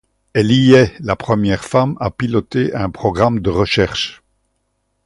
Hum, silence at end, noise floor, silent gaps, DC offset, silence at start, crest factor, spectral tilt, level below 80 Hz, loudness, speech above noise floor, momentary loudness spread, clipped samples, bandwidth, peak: none; 0.9 s; -68 dBFS; none; under 0.1%; 0.35 s; 16 dB; -6.5 dB/octave; -38 dBFS; -16 LUFS; 53 dB; 10 LU; under 0.1%; 11.5 kHz; 0 dBFS